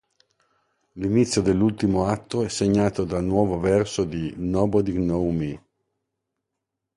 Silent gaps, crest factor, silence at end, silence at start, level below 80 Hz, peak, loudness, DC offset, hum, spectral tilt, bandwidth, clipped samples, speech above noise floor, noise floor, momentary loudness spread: none; 18 dB; 1.4 s; 0.95 s; -44 dBFS; -6 dBFS; -23 LUFS; under 0.1%; none; -6.5 dB/octave; 11.5 kHz; under 0.1%; 60 dB; -83 dBFS; 7 LU